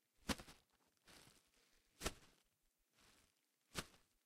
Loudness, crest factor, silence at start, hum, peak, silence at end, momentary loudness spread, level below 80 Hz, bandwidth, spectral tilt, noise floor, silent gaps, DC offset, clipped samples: -50 LUFS; 32 dB; 0.25 s; none; -24 dBFS; 0.3 s; 20 LU; -66 dBFS; 16 kHz; -3 dB/octave; -84 dBFS; none; under 0.1%; under 0.1%